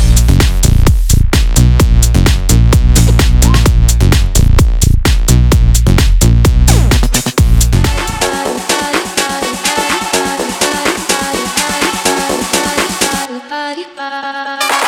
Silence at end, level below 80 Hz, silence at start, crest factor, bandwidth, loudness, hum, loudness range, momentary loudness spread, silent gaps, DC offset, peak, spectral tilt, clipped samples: 0 s; -12 dBFS; 0 s; 10 dB; 18 kHz; -11 LUFS; none; 4 LU; 6 LU; none; under 0.1%; 0 dBFS; -4.5 dB/octave; under 0.1%